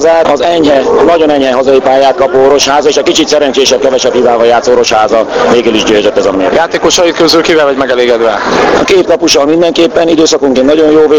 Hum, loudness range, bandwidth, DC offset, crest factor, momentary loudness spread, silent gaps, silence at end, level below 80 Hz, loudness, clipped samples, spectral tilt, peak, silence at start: none; 1 LU; 17 kHz; under 0.1%; 6 dB; 3 LU; none; 0 s; -38 dBFS; -7 LUFS; 3%; -3 dB/octave; 0 dBFS; 0 s